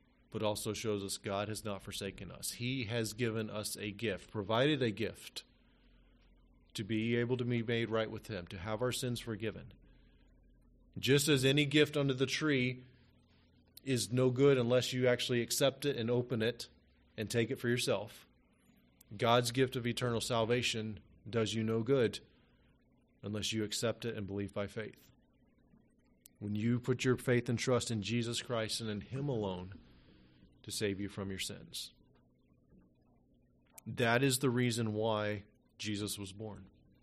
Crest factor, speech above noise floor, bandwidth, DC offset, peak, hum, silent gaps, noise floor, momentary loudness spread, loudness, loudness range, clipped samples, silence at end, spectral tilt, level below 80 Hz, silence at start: 22 dB; 35 dB; 13 kHz; under 0.1%; -14 dBFS; none; none; -70 dBFS; 15 LU; -35 LUFS; 8 LU; under 0.1%; 0.35 s; -4.5 dB/octave; -66 dBFS; 0.3 s